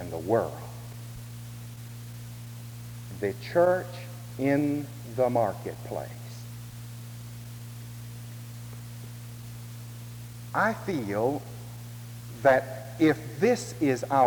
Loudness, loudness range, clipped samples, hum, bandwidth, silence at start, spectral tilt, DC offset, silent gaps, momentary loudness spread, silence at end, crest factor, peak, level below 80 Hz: -28 LUFS; 14 LU; under 0.1%; none; over 20 kHz; 0 s; -6.5 dB/octave; under 0.1%; none; 17 LU; 0 s; 22 dB; -8 dBFS; -58 dBFS